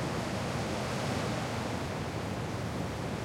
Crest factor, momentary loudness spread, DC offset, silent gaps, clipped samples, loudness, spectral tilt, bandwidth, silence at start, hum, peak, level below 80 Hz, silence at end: 14 dB; 3 LU; under 0.1%; none; under 0.1%; -35 LUFS; -5.5 dB/octave; 16.5 kHz; 0 s; none; -20 dBFS; -52 dBFS; 0 s